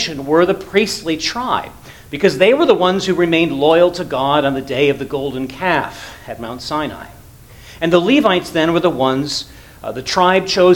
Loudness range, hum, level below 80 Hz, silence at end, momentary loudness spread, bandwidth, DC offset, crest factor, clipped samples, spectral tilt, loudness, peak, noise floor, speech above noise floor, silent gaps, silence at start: 5 LU; none; -44 dBFS; 0 s; 15 LU; 18.5 kHz; under 0.1%; 16 dB; under 0.1%; -5 dB/octave; -15 LUFS; 0 dBFS; -40 dBFS; 25 dB; none; 0 s